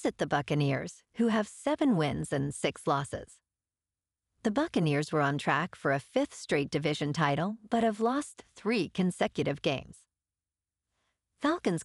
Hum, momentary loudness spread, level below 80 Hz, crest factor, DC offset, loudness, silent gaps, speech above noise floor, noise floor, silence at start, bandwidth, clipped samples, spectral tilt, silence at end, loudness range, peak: none; 5 LU; -62 dBFS; 18 dB; under 0.1%; -31 LUFS; none; over 60 dB; under -90 dBFS; 0 s; 12 kHz; under 0.1%; -6 dB/octave; 0 s; 3 LU; -12 dBFS